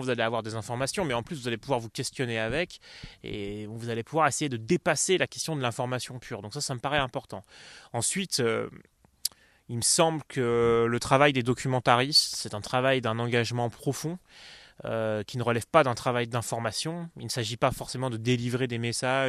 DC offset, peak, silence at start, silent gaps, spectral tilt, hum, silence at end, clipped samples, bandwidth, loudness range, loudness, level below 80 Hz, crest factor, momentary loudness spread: under 0.1%; -4 dBFS; 0 s; none; -4 dB/octave; none; 0 s; under 0.1%; 14.5 kHz; 7 LU; -28 LUFS; -56 dBFS; 24 dB; 14 LU